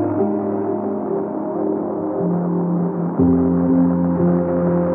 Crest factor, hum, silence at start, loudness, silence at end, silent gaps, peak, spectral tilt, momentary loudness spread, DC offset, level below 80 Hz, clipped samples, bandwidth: 14 dB; none; 0 s; -19 LUFS; 0 s; none; -4 dBFS; -14 dB/octave; 7 LU; under 0.1%; -48 dBFS; under 0.1%; 2.4 kHz